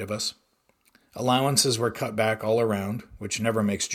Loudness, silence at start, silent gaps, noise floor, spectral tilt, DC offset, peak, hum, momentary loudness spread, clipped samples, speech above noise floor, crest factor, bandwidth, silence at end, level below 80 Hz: -25 LUFS; 0 s; none; -67 dBFS; -4 dB/octave; under 0.1%; -8 dBFS; none; 11 LU; under 0.1%; 41 dB; 20 dB; 17.5 kHz; 0 s; -60 dBFS